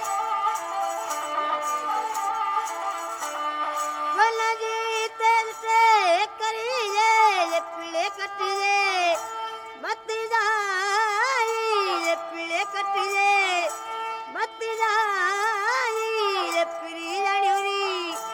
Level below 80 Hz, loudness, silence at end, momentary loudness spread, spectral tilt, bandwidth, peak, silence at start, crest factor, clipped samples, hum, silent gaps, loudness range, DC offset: -76 dBFS; -24 LUFS; 0 s; 10 LU; 0.5 dB/octave; 19.5 kHz; -6 dBFS; 0 s; 18 dB; under 0.1%; none; none; 4 LU; under 0.1%